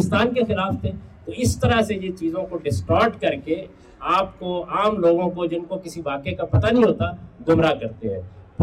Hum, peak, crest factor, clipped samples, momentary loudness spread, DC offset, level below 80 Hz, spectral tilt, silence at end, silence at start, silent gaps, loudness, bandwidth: none; -8 dBFS; 14 dB; under 0.1%; 11 LU; under 0.1%; -42 dBFS; -6.5 dB/octave; 0 s; 0 s; none; -22 LUFS; 16 kHz